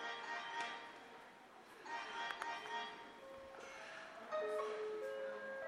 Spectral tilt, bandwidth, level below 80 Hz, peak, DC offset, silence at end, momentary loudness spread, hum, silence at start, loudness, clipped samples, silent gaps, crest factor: -2 dB/octave; 15.5 kHz; -84 dBFS; -24 dBFS; under 0.1%; 0 s; 13 LU; none; 0 s; -47 LUFS; under 0.1%; none; 22 dB